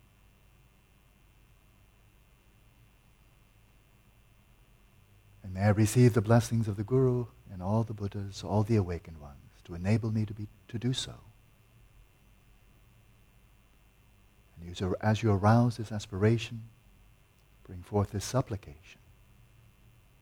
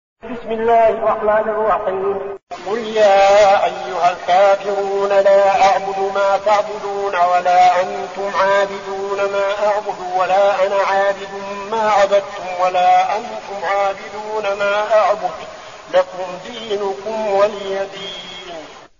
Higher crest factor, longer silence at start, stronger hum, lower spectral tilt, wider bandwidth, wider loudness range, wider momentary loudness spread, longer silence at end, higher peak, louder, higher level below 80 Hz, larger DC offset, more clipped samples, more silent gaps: first, 22 dB vs 14 dB; first, 5.45 s vs 0.25 s; neither; first, -7 dB/octave vs -1 dB/octave; first, 16 kHz vs 7.4 kHz; first, 11 LU vs 5 LU; first, 21 LU vs 15 LU; first, 1.3 s vs 0.15 s; second, -12 dBFS vs -2 dBFS; second, -30 LUFS vs -16 LUFS; second, -58 dBFS vs -52 dBFS; second, under 0.1% vs 0.2%; neither; second, none vs 2.43-2.47 s